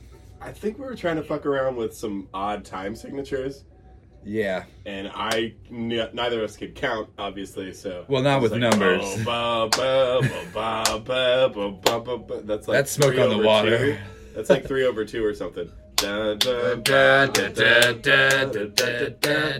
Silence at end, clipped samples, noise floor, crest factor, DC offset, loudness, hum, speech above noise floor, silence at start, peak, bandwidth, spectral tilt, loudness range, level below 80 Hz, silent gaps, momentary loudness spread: 0 s; under 0.1%; -49 dBFS; 24 dB; under 0.1%; -22 LUFS; none; 26 dB; 0 s; 0 dBFS; 16.5 kHz; -3.5 dB/octave; 11 LU; -50 dBFS; none; 16 LU